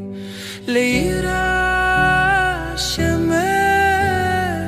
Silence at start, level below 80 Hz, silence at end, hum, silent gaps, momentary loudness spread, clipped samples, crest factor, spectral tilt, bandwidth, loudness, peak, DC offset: 0 s; -34 dBFS; 0 s; none; none; 7 LU; under 0.1%; 14 dB; -4.5 dB/octave; 15 kHz; -17 LUFS; -4 dBFS; under 0.1%